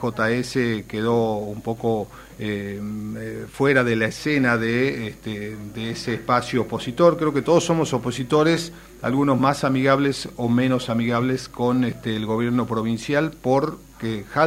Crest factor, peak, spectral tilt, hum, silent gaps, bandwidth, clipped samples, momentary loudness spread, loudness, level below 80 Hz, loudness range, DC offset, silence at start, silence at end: 20 dB; -2 dBFS; -6 dB/octave; none; none; 16 kHz; under 0.1%; 12 LU; -22 LUFS; -50 dBFS; 3 LU; under 0.1%; 0 s; 0 s